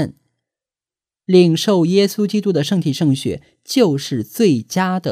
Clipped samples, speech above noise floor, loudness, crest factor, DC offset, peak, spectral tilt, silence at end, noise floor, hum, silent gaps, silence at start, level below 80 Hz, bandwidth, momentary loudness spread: under 0.1%; over 74 dB; -16 LUFS; 16 dB; under 0.1%; 0 dBFS; -6 dB/octave; 0 s; under -90 dBFS; none; none; 0 s; -58 dBFS; 15.5 kHz; 11 LU